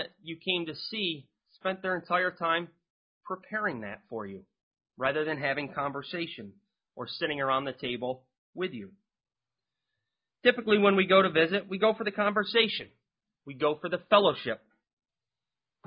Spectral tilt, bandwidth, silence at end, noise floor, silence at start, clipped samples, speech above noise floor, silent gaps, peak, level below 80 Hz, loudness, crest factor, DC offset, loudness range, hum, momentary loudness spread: -8.5 dB/octave; 5.4 kHz; 1.3 s; under -90 dBFS; 0 s; under 0.1%; over 61 dB; 2.90-3.21 s, 4.63-4.71 s, 8.38-8.53 s; -8 dBFS; -72 dBFS; -29 LUFS; 22 dB; under 0.1%; 9 LU; none; 17 LU